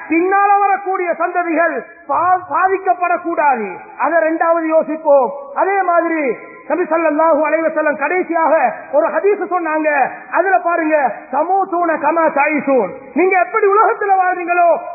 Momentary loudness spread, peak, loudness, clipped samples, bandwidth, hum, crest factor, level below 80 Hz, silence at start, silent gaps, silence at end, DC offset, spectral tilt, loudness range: 6 LU; 0 dBFS; -15 LUFS; under 0.1%; 2.7 kHz; none; 14 dB; -68 dBFS; 0 s; none; 0 s; under 0.1%; -13.5 dB/octave; 1 LU